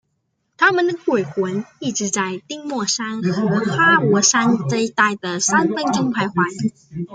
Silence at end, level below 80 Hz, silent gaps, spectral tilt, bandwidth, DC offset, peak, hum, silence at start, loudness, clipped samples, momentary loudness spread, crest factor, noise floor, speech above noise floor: 0 s; -62 dBFS; none; -3.5 dB/octave; 10 kHz; under 0.1%; -2 dBFS; none; 0.6 s; -18 LUFS; under 0.1%; 11 LU; 18 dB; -71 dBFS; 52 dB